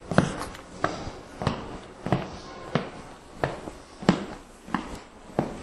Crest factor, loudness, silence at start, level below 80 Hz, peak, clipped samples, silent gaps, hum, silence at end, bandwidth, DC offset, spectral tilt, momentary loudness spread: 30 dB; -31 LUFS; 0 s; -48 dBFS; -2 dBFS; under 0.1%; none; none; 0 s; 12.5 kHz; under 0.1%; -6 dB/octave; 15 LU